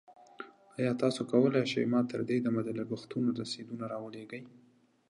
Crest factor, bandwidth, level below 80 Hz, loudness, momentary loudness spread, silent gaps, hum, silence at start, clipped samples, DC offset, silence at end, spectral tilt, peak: 20 dB; 11 kHz; -78 dBFS; -32 LUFS; 18 LU; none; none; 0.1 s; under 0.1%; under 0.1%; 0.6 s; -6.5 dB/octave; -12 dBFS